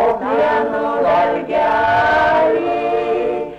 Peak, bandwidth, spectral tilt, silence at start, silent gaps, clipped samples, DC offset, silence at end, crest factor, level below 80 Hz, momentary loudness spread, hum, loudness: -8 dBFS; 8.4 kHz; -6 dB/octave; 0 s; none; under 0.1%; under 0.1%; 0 s; 8 dB; -46 dBFS; 5 LU; none; -16 LUFS